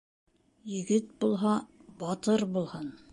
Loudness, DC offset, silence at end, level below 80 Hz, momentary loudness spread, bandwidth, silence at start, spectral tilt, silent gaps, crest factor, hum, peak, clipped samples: -31 LUFS; under 0.1%; 0.15 s; -70 dBFS; 12 LU; 11.5 kHz; 0.65 s; -6 dB/octave; none; 16 dB; none; -14 dBFS; under 0.1%